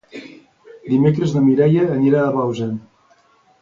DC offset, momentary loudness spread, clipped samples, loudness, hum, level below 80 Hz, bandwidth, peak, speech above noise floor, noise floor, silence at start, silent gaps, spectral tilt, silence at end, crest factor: under 0.1%; 20 LU; under 0.1%; -17 LUFS; none; -56 dBFS; 7.4 kHz; -2 dBFS; 40 dB; -55 dBFS; 0.15 s; none; -9 dB/octave; 0.85 s; 16 dB